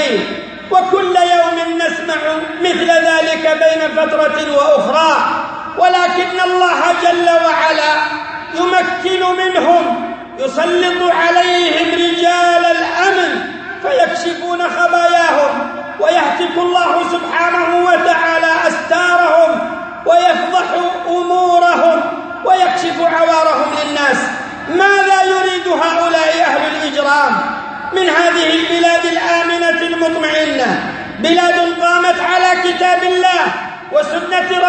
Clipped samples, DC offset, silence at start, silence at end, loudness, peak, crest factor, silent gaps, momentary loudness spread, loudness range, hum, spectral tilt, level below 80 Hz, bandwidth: under 0.1%; under 0.1%; 0 s; 0 s; -13 LUFS; 0 dBFS; 12 dB; none; 7 LU; 1 LU; none; -3 dB/octave; -56 dBFS; 8.8 kHz